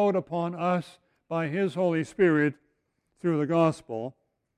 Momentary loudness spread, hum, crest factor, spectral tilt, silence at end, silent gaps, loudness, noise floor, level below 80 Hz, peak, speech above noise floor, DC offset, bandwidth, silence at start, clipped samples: 12 LU; none; 16 dB; -7.5 dB/octave; 0.45 s; none; -27 LUFS; -75 dBFS; -68 dBFS; -10 dBFS; 49 dB; under 0.1%; 11 kHz; 0 s; under 0.1%